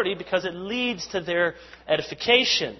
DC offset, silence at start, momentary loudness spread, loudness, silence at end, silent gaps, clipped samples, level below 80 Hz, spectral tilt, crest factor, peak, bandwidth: under 0.1%; 0 s; 10 LU; -24 LUFS; 0 s; none; under 0.1%; -58 dBFS; -3 dB/octave; 22 dB; -2 dBFS; 6.2 kHz